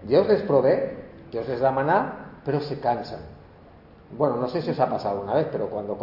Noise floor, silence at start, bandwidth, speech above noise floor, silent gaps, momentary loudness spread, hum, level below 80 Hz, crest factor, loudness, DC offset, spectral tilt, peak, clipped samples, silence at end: -49 dBFS; 0 s; 5.8 kHz; 26 dB; none; 15 LU; none; -56 dBFS; 18 dB; -24 LUFS; under 0.1%; -9 dB/octave; -6 dBFS; under 0.1%; 0 s